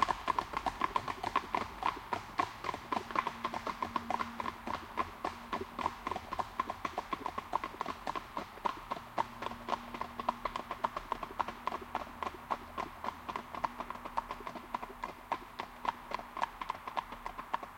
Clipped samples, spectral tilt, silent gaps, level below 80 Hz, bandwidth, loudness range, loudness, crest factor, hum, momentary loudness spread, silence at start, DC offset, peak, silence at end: under 0.1%; -4 dB/octave; none; -60 dBFS; 16.5 kHz; 4 LU; -39 LUFS; 26 dB; none; 7 LU; 0 s; under 0.1%; -14 dBFS; 0 s